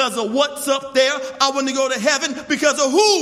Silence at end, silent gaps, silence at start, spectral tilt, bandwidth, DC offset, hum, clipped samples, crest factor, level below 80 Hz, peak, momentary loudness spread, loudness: 0 s; none; 0 s; -1.5 dB/octave; 16 kHz; under 0.1%; none; under 0.1%; 16 dB; -64 dBFS; -2 dBFS; 5 LU; -18 LUFS